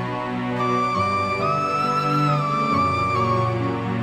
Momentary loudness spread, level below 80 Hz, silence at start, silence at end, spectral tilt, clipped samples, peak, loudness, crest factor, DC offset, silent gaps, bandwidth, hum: 4 LU; -46 dBFS; 0 s; 0 s; -6.5 dB/octave; under 0.1%; -10 dBFS; -21 LUFS; 12 dB; under 0.1%; none; 13.5 kHz; none